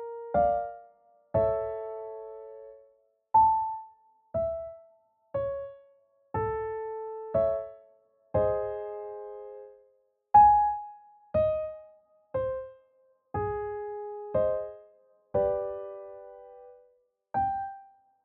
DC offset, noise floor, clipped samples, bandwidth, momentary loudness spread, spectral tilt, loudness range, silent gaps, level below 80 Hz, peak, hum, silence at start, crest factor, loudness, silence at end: under 0.1%; -68 dBFS; under 0.1%; 4 kHz; 22 LU; -7.5 dB/octave; 8 LU; none; -56 dBFS; -8 dBFS; none; 0 s; 22 dB; -29 LUFS; 0.4 s